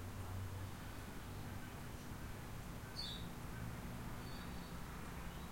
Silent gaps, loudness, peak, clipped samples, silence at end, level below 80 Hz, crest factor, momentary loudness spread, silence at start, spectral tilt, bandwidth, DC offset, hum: none; -49 LUFS; -32 dBFS; under 0.1%; 0 s; -54 dBFS; 14 dB; 4 LU; 0 s; -5 dB/octave; 16.5 kHz; 0.1%; none